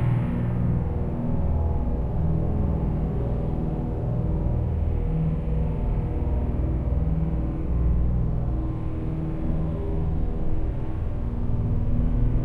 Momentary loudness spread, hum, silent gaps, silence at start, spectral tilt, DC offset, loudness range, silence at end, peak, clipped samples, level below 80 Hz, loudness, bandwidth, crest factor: 4 LU; 60 Hz at -35 dBFS; none; 0 s; -11.5 dB/octave; under 0.1%; 2 LU; 0 s; -12 dBFS; under 0.1%; -28 dBFS; -27 LUFS; 3.6 kHz; 12 dB